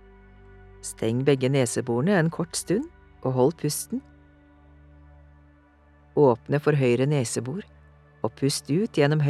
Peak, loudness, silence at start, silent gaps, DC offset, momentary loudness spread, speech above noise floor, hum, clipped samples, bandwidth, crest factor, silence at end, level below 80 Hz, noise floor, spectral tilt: -6 dBFS; -25 LUFS; 0.85 s; none; under 0.1%; 12 LU; 33 dB; none; under 0.1%; 14 kHz; 20 dB; 0 s; -56 dBFS; -56 dBFS; -5.5 dB/octave